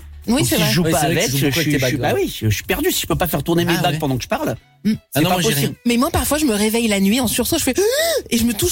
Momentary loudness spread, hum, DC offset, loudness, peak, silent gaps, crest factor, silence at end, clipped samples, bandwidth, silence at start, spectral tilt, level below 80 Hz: 5 LU; none; under 0.1%; -18 LUFS; -6 dBFS; none; 12 dB; 0 s; under 0.1%; 17 kHz; 0 s; -4 dB/octave; -38 dBFS